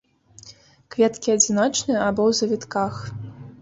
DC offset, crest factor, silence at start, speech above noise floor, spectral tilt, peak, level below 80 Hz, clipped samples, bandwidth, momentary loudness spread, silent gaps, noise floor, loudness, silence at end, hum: under 0.1%; 20 dB; 0.45 s; 28 dB; -3.5 dB/octave; -4 dBFS; -56 dBFS; under 0.1%; 8 kHz; 16 LU; none; -49 dBFS; -21 LUFS; 0.05 s; none